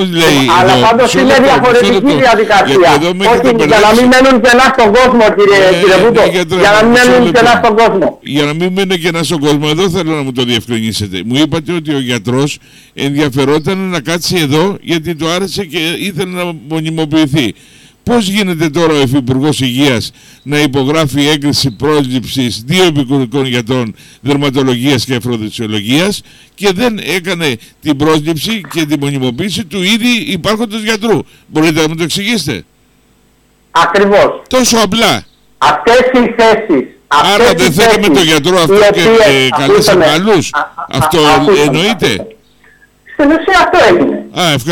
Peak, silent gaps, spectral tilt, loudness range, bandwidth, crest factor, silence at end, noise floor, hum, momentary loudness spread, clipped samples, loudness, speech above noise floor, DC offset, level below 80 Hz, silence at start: -2 dBFS; none; -4.5 dB/octave; 7 LU; 19 kHz; 8 dB; 0 s; -50 dBFS; none; 9 LU; under 0.1%; -9 LUFS; 40 dB; under 0.1%; -38 dBFS; 0 s